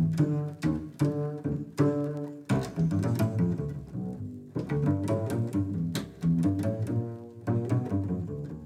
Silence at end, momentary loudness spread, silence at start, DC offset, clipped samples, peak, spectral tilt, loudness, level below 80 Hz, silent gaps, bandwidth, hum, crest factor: 0 s; 10 LU; 0 s; under 0.1%; under 0.1%; -14 dBFS; -8.5 dB/octave; -30 LUFS; -54 dBFS; none; 14 kHz; none; 16 dB